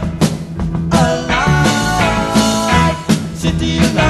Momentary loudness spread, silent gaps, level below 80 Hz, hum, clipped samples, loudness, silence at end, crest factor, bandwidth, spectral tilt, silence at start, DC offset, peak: 5 LU; none; -26 dBFS; none; under 0.1%; -14 LUFS; 0 s; 14 dB; 13 kHz; -5 dB/octave; 0 s; 0.1%; 0 dBFS